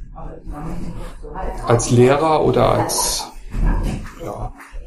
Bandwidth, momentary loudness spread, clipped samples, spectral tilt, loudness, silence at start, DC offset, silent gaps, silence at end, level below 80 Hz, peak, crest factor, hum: 15 kHz; 20 LU; under 0.1%; -5 dB/octave; -17 LUFS; 0 s; under 0.1%; none; 0 s; -28 dBFS; 0 dBFS; 18 dB; none